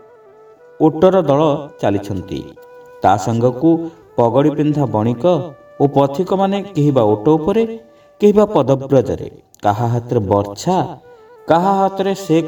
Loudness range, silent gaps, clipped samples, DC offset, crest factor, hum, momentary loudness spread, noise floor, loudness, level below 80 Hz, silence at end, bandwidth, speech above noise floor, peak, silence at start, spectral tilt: 2 LU; none; under 0.1%; under 0.1%; 16 dB; none; 11 LU; -44 dBFS; -16 LUFS; -50 dBFS; 0 s; 19 kHz; 29 dB; 0 dBFS; 0.8 s; -7.5 dB/octave